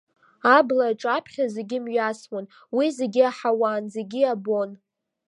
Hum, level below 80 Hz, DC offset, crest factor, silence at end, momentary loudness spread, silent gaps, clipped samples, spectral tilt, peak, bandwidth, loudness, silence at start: none; -80 dBFS; under 0.1%; 20 dB; 0.55 s; 13 LU; none; under 0.1%; -5 dB/octave; -4 dBFS; 11 kHz; -23 LUFS; 0.45 s